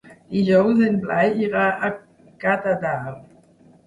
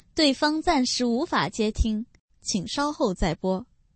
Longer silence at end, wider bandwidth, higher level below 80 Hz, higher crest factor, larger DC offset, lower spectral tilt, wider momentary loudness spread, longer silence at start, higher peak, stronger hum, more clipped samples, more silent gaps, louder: first, 0.65 s vs 0.35 s; first, 10.5 kHz vs 8.8 kHz; second, -60 dBFS vs -36 dBFS; about the same, 16 dB vs 18 dB; neither; first, -8 dB/octave vs -4 dB/octave; first, 11 LU vs 8 LU; about the same, 0.05 s vs 0.15 s; first, -4 dBFS vs -8 dBFS; neither; neither; second, none vs 2.20-2.28 s; first, -20 LUFS vs -25 LUFS